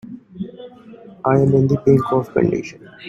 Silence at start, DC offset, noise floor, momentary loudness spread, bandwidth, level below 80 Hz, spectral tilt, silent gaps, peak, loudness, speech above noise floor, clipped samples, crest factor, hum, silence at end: 0.05 s; under 0.1%; -41 dBFS; 18 LU; 7.2 kHz; -50 dBFS; -9 dB/octave; none; -2 dBFS; -17 LUFS; 25 dB; under 0.1%; 16 dB; none; 0 s